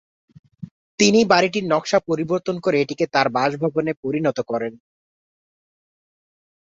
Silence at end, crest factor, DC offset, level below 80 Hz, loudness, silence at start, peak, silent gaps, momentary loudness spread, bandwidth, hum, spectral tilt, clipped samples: 1.9 s; 20 dB; under 0.1%; -62 dBFS; -20 LUFS; 0.6 s; -2 dBFS; 0.71-0.98 s, 3.97-4.03 s; 14 LU; 8.4 kHz; none; -4.5 dB/octave; under 0.1%